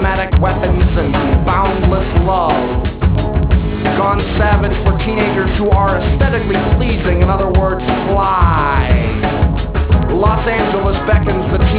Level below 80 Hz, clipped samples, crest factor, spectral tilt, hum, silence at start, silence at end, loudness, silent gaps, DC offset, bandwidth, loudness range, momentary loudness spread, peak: -16 dBFS; under 0.1%; 12 dB; -11 dB/octave; none; 0 s; 0 s; -14 LUFS; none; under 0.1%; 4 kHz; 1 LU; 3 LU; 0 dBFS